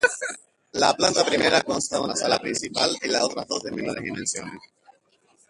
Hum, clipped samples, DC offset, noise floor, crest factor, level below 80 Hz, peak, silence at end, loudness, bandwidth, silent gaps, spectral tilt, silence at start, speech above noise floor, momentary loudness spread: none; under 0.1%; under 0.1%; -63 dBFS; 20 dB; -60 dBFS; -4 dBFS; 0.9 s; -23 LUFS; 11.5 kHz; none; -2 dB/octave; 0 s; 39 dB; 12 LU